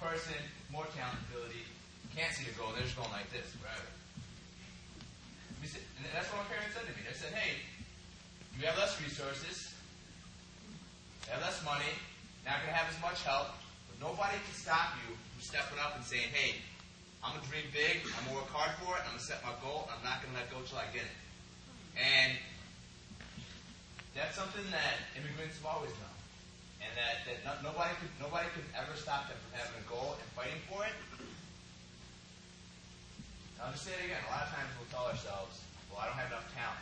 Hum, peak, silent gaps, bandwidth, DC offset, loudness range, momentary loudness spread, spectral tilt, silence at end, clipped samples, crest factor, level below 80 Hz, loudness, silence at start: none; -16 dBFS; none; 9 kHz; under 0.1%; 9 LU; 19 LU; -3 dB/octave; 0 s; under 0.1%; 24 dB; -60 dBFS; -39 LUFS; 0 s